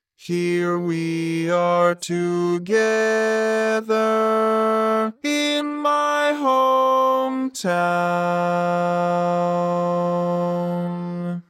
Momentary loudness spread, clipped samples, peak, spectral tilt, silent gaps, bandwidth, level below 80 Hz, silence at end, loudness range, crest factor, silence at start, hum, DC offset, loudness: 6 LU; under 0.1%; -6 dBFS; -5.5 dB/octave; none; 15 kHz; -74 dBFS; 0.1 s; 2 LU; 14 dB; 0.2 s; none; under 0.1%; -20 LUFS